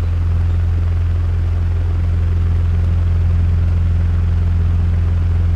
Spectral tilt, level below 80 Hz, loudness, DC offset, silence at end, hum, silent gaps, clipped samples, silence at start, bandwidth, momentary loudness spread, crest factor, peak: -9 dB/octave; -20 dBFS; -17 LUFS; under 0.1%; 0 s; none; none; under 0.1%; 0 s; 3.9 kHz; 2 LU; 8 dB; -6 dBFS